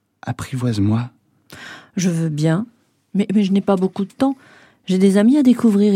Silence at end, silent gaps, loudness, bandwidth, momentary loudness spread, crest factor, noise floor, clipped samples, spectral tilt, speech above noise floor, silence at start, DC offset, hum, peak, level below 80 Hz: 0 s; none; -18 LUFS; 13.5 kHz; 19 LU; 16 dB; -42 dBFS; under 0.1%; -7 dB/octave; 26 dB; 0.25 s; under 0.1%; none; -2 dBFS; -58 dBFS